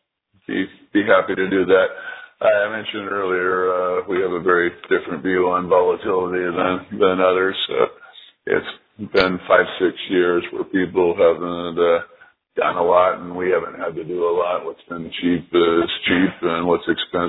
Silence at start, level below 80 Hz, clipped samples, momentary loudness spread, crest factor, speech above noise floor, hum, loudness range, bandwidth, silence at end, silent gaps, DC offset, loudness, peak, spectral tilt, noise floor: 0.5 s; -56 dBFS; under 0.1%; 9 LU; 20 dB; 26 dB; none; 2 LU; 5 kHz; 0 s; none; under 0.1%; -19 LUFS; 0 dBFS; -8 dB/octave; -45 dBFS